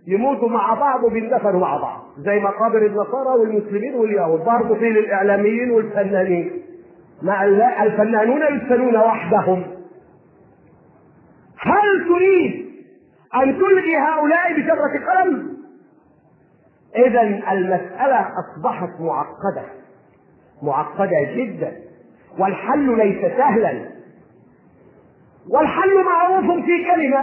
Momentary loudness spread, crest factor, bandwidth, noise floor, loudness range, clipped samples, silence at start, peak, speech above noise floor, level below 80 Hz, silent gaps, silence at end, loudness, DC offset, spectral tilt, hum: 11 LU; 16 dB; 3.2 kHz; -54 dBFS; 5 LU; under 0.1%; 0.05 s; -2 dBFS; 37 dB; -62 dBFS; none; 0 s; -18 LUFS; under 0.1%; -11 dB/octave; none